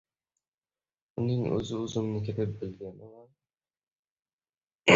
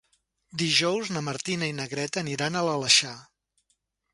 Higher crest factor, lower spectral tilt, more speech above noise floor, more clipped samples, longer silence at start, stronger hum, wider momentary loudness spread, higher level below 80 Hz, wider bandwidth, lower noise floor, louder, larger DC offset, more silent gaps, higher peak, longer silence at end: about the same, 26 dB vs 22 dB; first, -5.5 dB/octave vs -2.5 dB/octave; first, over 58 dB vs 48 dB; neither; first, 1.15 s vs 0.55 s; neither; first, 15 LU vs 12 LU; first, -60 dBFS vs -68 dBFS; second, 8 kHz vs 11.5 kHz; first, under -90 dBFS vs -75 dBFS; second, -32 LUFS vs -25 LUFS; neither; first, 3.88-4.03 s, 4.11-4.16 s, 4.33-4.39 s, 4.49-4.61 s, 4.75-4.79 s vs none; about the same, -6 dBFS vs -6 dBFS; second, 0 s vs 0.9 s